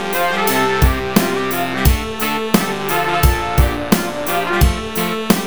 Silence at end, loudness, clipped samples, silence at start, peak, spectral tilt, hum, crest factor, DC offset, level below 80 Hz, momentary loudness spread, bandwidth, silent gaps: 0 s; -17 LUFS; under 0.1%; 0 s; 0 dBFS; -5 dB/octave; none; 16 dB; 2%; -22 dBFS; 4 LU; over 20 kHz; none